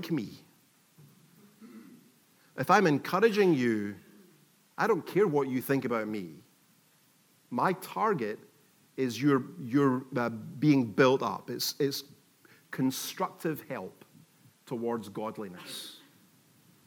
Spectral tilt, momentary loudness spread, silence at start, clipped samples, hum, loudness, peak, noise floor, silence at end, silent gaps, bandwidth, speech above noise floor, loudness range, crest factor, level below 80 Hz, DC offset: -5.5 dB/octave; 17 LU; 0 s; under 0.1%; none; -30 LUFS; -8 dBFS; -65 dBFS; 0.9 s; none; 19 kHz; 36 dB; 8 LU; 22 dB; -88 dBFS; under 0.1%